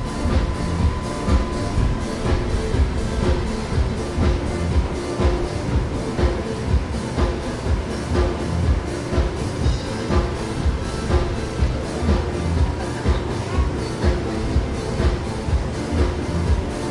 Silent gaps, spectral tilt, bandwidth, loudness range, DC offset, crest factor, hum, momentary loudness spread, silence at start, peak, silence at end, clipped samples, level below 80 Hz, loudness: none; -6.5 dB/octave; 11.5 kHz; 1 LU; under 0.1%; 16 dB; none; 3 LU; 0 s; -6 dBFS; 0 s; under 0.1%; -24 dBFS; -23 LUFS